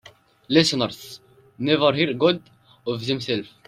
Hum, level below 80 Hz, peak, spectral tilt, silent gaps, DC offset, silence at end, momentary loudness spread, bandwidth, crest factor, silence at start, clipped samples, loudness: none; -62 dBFS; -4 dBFS; -5 dB/octave; none; under 0.1%; 0.2 s; 13 LU; 15.5 kHz; 20 dB; 0.5 s; under 0.1%; -22 LUFS